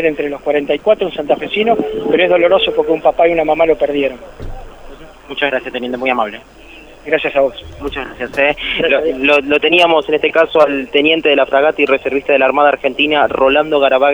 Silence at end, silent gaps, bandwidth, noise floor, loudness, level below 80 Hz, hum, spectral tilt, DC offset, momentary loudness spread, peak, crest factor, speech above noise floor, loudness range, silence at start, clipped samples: 0 s; none; over 20 kHz; -34 dBFS; -13 LUFS; -40 dBFS; none; -5 dB/octave; under 0.1%; 11 LU; 0 dBFS; 14 dB; 21 dB; 7 LU; 0 s; under 0.1%